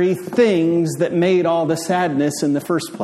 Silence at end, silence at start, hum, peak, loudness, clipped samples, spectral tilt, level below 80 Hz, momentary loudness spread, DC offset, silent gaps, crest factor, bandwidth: 0 s; 0 s; none; -4 dBFS; -18 LUFS; under 0.1%; -6 dB/octave; -62 dBFS; 4 LU; under 0.1%; none; 14 dB; 14 kHz